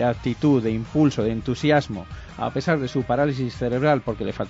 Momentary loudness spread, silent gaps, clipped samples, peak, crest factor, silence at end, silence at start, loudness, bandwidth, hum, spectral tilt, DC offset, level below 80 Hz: 8 LU; none; under 0.1%; -6 dBFS; 16 dB; 0 s; 0 s; -23 LUFS; 8 kHz; none; -7 dB/octave; under 0.1%; -44 dBFS